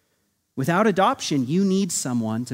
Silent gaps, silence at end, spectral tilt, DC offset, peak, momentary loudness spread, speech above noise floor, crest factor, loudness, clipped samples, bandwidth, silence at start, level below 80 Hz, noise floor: none; 0 s; -5 dB/octave; under 0.1%; -6 dBFS; 7 LU; 49 dB; 18 dB; -22 LUFS; under 0.1%; 16 kHz; 0.55 s; -66 dBFS; -70 dBFS